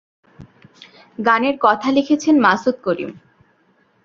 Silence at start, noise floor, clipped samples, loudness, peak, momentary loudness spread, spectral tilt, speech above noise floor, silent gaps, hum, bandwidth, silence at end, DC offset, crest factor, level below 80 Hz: 0.4 s; -59 dBFS; under 0.1%; -17 LUFS; 0 dBFS; 11 LU; -5 dB/octave; 43 dB; none; none; 7.4 kHz; 0.85 s; under 0.1%; 18 dB; -60 dBFS